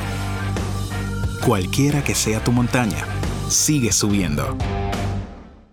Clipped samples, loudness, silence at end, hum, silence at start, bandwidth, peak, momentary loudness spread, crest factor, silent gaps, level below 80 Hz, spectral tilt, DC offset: under 0.1%; -21 LUFS; 0.15 s; none; 0 s; 19.5 kHz; -4 dBFS; 9 LU; 18 dB; none; -32 dBFS; -4.5 dB/octave; under 0.1%